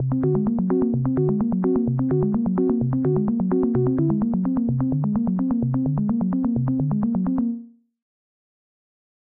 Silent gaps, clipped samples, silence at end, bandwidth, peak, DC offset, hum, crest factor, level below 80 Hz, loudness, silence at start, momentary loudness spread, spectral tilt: none; under 0.1%; 1.7 s; 2.3 kHz; -10 dBFS; 0.1%; none; 12 dB; -46 dBFS; -22 LUFS; 0 s; 2 LU; -15.5 dB/octave